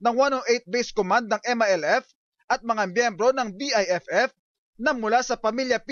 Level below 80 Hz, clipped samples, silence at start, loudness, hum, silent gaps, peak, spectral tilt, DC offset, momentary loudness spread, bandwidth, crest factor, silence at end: -64 dBFS; under 0.1%; 0 s; -24 LUFS; none; 2.15-2.32 s, 2.44-2.48 s, 4.39-4.73 s; -10 dBFS; -3 dB/octave; under 0.1%; 5 LU; 7.4 kHz; 14 dB; 0 s